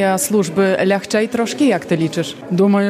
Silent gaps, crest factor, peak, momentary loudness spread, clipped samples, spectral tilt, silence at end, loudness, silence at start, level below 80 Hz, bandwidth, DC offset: none; 12 dB; -4 dBFS; 5 LU; under 0.1%; -5 dB/octave; 0 s; -17 LUFS; 0 s; -60 dBFS; 15.5 kHz; under 0.1%